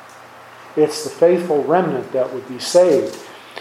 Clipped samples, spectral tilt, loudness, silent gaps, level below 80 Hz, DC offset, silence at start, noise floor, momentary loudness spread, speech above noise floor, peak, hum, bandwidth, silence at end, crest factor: under 0.1%; -5 dB/octave; -17 LUFS; none; -70 dBFS; under 0.1%; 0.05 s; -40 dBFS; 13 LU; 24 dB; -2 dBFS; none; 15 kHz; 0 s; 18 dB